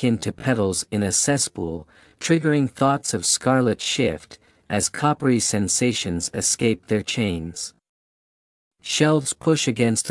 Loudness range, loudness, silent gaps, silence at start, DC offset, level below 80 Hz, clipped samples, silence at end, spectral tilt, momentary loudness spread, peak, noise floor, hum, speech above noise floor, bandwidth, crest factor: 3 LU; -21 LUFS; 7.89-8.71 s; 0 s; under 0.1%; -56 dBFS; under 0.1%; 0 s; -4 dB/octave; 10 LU; -4 dBFS; under -90 dBFS; none; over 68 dB; 12 kHz; 18 dB